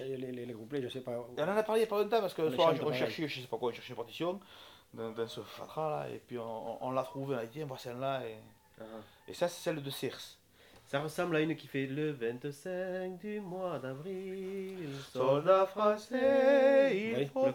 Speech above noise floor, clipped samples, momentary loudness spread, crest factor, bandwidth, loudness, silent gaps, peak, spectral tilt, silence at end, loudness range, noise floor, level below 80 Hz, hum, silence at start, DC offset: 28 dB; under 0.1%; 16 LU; 20 dB; 18.5 kHz; -34 LUFS; none; -14 dBFS; -5.5 dB/octave; 0 s; 10 LU; -61 dBFS; -76 dBFS; none; 0 s; under 0.1%